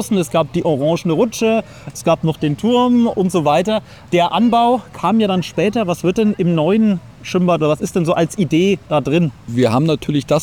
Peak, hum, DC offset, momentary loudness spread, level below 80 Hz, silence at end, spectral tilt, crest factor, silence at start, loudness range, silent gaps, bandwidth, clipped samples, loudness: -4 dBFS; none; 0.2%; 5 LU; -48 dBFS; 0 s; -6.5 dB/octave; 12 dB; 0 s; 1 LU; none; 18.5 kHz; under 0.1%; -16 LUFS